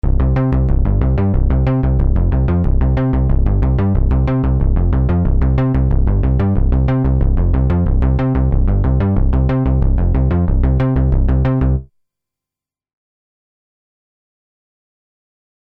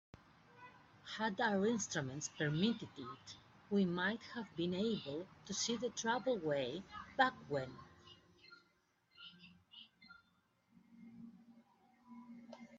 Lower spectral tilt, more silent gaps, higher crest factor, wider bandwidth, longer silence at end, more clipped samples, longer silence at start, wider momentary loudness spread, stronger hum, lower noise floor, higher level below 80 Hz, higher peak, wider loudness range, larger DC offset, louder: first, -11.5 dB/octave vs -4 dB/octave; neither; second, 12 dB vs 24 dB; second, 3.6 kHz vs 8 kHz; first, 3.9 s vs 0 s; neither; second, 0.05 s vs 0.55 s; second, 1 LU vs 23 LU; neither; first, -88 dBFS vs -77 dBFS; first, -16 dBFS vs -76 dBFS; first, -2 dBFS vs -18 dBFS; second, 4 LU vs 21 LU; neither; first, -16 LUFS vs -39 LUFS